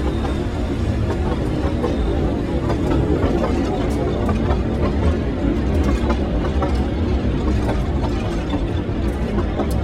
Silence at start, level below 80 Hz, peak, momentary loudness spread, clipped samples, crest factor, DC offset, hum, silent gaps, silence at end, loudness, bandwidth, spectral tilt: 0 s; -24 dBFS; -4 dBFS; 3 LU; under 0.1%; 14 dB; under 0.1%; none; none; 0 s; -21 LUFS; 11.5 kHz; -8 dB/octave